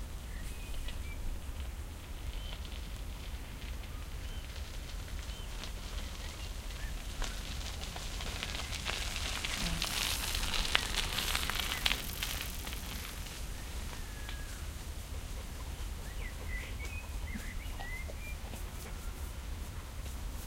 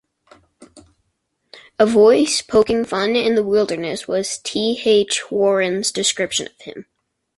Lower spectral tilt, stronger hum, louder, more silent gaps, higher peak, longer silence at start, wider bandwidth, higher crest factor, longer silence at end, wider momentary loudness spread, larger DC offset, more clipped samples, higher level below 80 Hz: about the same, -2.5 dB/octave vs -3 dB/octave; neither; second, -39 LUFS vs -17 LUFS; neither; about the same, -4 dBFS vs -2 dBFS; second, 0 s vs 0.6 s; first, 17 kHz vs 11.5 kHz; first, 36 dB vs 18 dB; second, 0 s vs 0.55 s; about the same, 12 LU vs 11 LU; neither; neither; first, -42 dBFS vs -54 dBFS